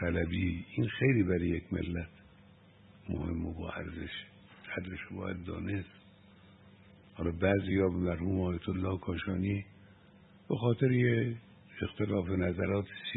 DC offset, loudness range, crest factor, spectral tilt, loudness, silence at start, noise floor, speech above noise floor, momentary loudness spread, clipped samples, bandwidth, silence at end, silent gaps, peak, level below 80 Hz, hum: under 0.1%; 8 LU; 20 dB; -11 dB/octave; -34 LUFS; 0 s; -59 dBFS; 27 dB; 13 LU; under 0.1%; 4.1 kHz; 0 s; none; -14 dBFS; -52 dBFS; none